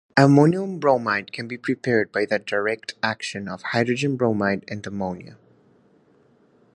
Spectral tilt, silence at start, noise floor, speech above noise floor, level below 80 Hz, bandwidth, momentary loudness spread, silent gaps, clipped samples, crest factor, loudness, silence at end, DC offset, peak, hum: -6.5 dB/octave; 0.15 s; -58 dBFS; 36 dB; -60 dBFS; 10.5 kHz; 13 LU; none; under 0.1%; 22 dB; -22 LUFS; 1.4 s; under 0.1%; 0 dBFS; none